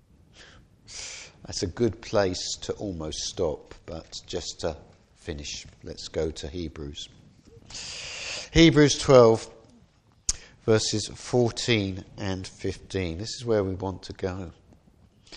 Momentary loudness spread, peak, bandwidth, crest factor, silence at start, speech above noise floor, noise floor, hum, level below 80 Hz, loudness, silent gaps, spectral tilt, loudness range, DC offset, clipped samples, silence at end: 20 LU; -4 dBFS; 11.5 kHz; 24 dB; 0.4 s; 34 dB; -60 dBFS; none; -46 dBFS; -26 LUFS; none; -4.5 dB/octave; 13 LU; under 0.1%; under 0.1%; 0 s